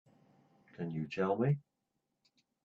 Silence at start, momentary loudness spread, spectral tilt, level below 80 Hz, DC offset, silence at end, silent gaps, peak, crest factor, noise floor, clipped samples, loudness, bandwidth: 0.8 s; 10 LU; -9 dB/octave; -76 dBFS; under 0.1%; 1.05 s; none; -20 dBFS; 18 dB; -85 dBFS; under 0.1%; -36 LUFS; 7 kHz